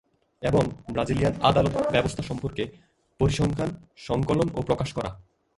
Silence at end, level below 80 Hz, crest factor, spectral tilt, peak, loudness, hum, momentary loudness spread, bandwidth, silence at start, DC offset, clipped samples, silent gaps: 0.35 s; -44 dBFS; 22 dB; -6.5 dB/octave; -4 dBFS; -26 LUFS; none; 11 LU; 11.5 kHz; 0.4 s; under 0.1%; under 0.1%; none